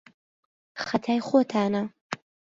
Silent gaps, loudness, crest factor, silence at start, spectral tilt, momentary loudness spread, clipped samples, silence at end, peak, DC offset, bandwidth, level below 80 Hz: 2.01-2.10 s; -26 LUFS; 20 dB; 0.75 s; -6 dB/octave; 15 LU; under 0.1%; 0.35 s; -8 dBFS; under 0.1%; 7.8 kHz; -68 dBFS